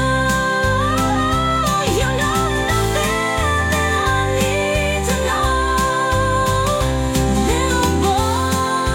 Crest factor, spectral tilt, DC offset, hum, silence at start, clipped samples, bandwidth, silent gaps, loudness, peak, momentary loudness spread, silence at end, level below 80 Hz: 12 dB; -4.5 dB/octave; under 0.1%; none; 0 s; under 0.1%; 17 kHz; none; -17 LUFS; -4 dBFS; 1 LU; 0 s; -26 dBFS